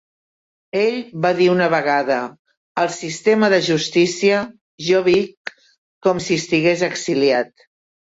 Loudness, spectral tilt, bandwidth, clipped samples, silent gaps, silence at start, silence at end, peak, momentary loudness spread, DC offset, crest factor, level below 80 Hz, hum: -18 LUFS; -4.5 dB/octave; 8 kHz; under 0.1%; 2.39-2.45 s, 2.57-2.75 s, 4.61-4.78 s, 5.37-5.45 s, 5.78-6.01 s; 0.75 s; 0.65 s; -4 dBFS; 12 LU; under 0.1%; 16 dB; -60 dBFS; none